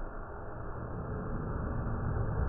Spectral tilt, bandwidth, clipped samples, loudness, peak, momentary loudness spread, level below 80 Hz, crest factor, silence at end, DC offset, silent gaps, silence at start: -6.5 dB/octave; 2.8 kHz; under 0.1%; -38 LUFS; -20 dBFS; 9 LU; -40 dBFS; 14 dB; 0 s; under 0.1%; none; 0 s